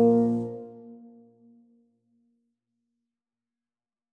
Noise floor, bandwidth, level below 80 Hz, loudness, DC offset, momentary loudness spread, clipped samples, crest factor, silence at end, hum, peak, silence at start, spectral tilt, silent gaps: under -90 dBFS; 2 kHz; -72 dBFS; -25 LUFS; under 0.1%; 26 LU; under 0.1%; 20 dB; 3.15 s; none; -10 dBFS; 0 s; -11 dB/octave; none